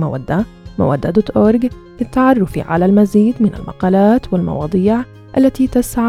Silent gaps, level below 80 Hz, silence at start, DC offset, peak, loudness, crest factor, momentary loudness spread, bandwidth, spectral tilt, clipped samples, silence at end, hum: none; -36 dBFS; 0 s; under 0.1%; 0 dBFS; -14 LUFS; 14 dB; 8 LU; 15 kHz; -8 dB/octave; under 0.1%; 0 s; none